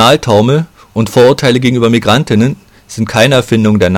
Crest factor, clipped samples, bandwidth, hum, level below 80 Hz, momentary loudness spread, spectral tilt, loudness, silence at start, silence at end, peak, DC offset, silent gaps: 10 dB; 0.3%; 16.5 kHz; none; -40 dBFS; 11 LU; -5.5 dB/octave; -10 LUFS; 0 s; 0 s; 0 dBFS; under 0.1%; none